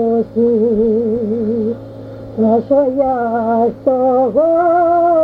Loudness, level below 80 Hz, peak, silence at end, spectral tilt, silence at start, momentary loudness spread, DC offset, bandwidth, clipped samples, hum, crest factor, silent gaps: -14 LUFS; -46 dBFS; -2 dBFS; 0 s; -10.5 dB/octave; 0 s; 8 LU; under 0.1%; 5 kHz; under 0.1%; none; 12 dB; none